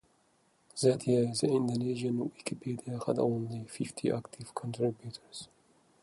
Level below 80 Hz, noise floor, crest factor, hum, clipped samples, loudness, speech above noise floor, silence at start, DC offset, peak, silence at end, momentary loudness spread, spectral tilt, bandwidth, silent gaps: -70 dBFS; -70 dBFS; 20 dB; none; under 0.1%; -33 LUFS; 38 dB; 0.75 s; under 0.1%; -14 dBFS; 0.6 s; 16 LU; -6 dB/octave; 11.5 kHz; none